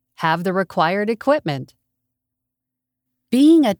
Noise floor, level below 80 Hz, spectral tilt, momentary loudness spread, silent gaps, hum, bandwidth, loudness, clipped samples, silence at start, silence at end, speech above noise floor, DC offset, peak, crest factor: -82 dBFS; -66 dBFS; -6.5 dB/octave; 10 LU; none; none; 18 kHz; -18 LUFS; under 0.1%; 0.2 s; 0.05 s; 65 dB; under 0.1%; -4 dBFS; 16 dB